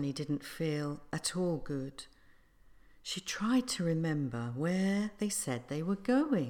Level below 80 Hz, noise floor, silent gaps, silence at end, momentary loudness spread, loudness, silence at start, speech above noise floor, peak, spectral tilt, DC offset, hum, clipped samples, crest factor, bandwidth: -62 dBFS; -62 dBFS; none; 0 s; 9 LU; -34 LUFS; 0 s; 28 dB; -18 dBFS; -5 dB/octave; under 0.1%; none; under 0.1%; 16 dB; 18 kHz